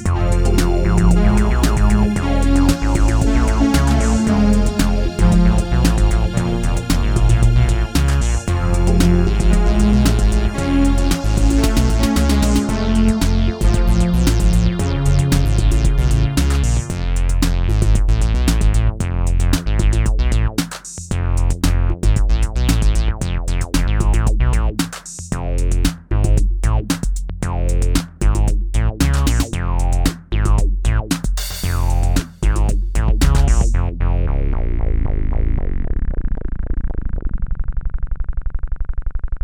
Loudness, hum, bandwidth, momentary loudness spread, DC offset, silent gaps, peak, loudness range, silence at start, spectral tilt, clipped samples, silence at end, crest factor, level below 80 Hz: -18 LUFS; none; 16 kHz; 9 LU; under 0.1%; none; 0 dBFS; 4 LU; 0 s; -6 dB/octave; under 0.1%; 0.05 s; 14 dB; -16 dBFS